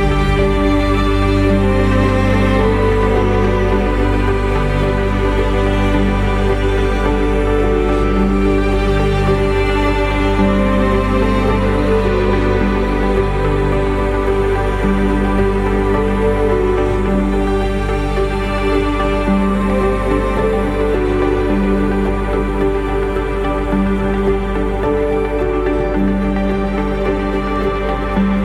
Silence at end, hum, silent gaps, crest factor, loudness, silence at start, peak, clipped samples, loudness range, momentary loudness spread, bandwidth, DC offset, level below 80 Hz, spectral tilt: 0 s; none; none; 14 dB; -16 LUFS; 0 s; -2 dBFS; under 0.1%; 3 LU; 4 LU; 11 kHz; under 0.1%; -20 dBFS; -7.5 dB/octave